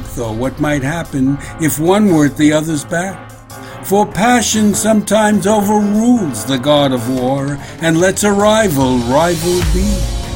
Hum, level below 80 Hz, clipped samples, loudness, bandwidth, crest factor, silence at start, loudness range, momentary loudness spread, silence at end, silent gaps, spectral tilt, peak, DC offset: none; -28 dBFS; under 0.1%; -13 LUFS; 16.5 kHz; 14 dB; 0 s; 2 LU; 8 LU; 0 s; none; -5 dB/octave; 0 dBFS; under 0.1%